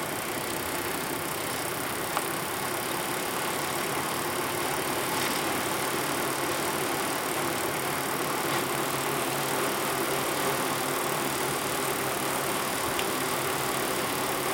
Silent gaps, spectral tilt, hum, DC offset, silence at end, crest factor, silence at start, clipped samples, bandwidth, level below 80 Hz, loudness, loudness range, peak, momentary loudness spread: none; -2.5 dB/octave; none; under 0.1%; 0 s; 20 dB; 0 s; under 0.1%; 17 kHz; -60 dBFS; -28 LUFS; 2 LU; -10 dBFS; 3 LU